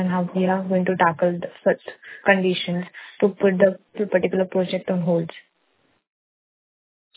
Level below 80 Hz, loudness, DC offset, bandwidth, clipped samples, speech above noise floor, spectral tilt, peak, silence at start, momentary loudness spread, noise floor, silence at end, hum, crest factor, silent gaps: -66 dBFS; -22 LUFS; under 0.1%; 4 kHz; under 0.1%; 45 dB; -10.5 dB/octave; -2 dBFS; 0 s; 9 LU; -66 dBFS; 1.75 s; none; 20 dB; none